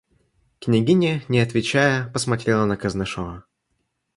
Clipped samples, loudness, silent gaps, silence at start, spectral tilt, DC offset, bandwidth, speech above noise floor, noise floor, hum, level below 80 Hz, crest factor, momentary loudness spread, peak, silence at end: under 0.1%; -21 LUFS; none; 0.6 s; -5.5 dB/octave; under 0.1%; 11.5 kHz; 53 dB; -73 dBFS; none; -50 dBFS; 18 dB; 13 LU; -4 dBFS; 0.75 s